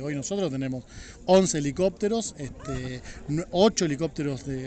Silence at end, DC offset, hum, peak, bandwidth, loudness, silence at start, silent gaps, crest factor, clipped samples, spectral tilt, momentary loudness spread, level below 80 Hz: 0 s; under 0.1%; none; -8 dBFS; 9.2 kHz; -26 LUFS; 0 s; none; 20 dB; under 0.1%; -5 dB/octave; 15 LU; -48 dBFS